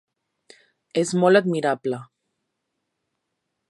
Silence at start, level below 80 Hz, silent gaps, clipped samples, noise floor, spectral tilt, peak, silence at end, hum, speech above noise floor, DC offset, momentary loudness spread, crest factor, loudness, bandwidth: 0.95 s; -76 dBFS; none; under 0.1%; -79 dBFS; -5.5 dB/octave; -2 dBFS; 1.65 s; none; 59 dB; under 0.1%; 12 LU; 22 dB; -21 LUFS; 11.5 kHz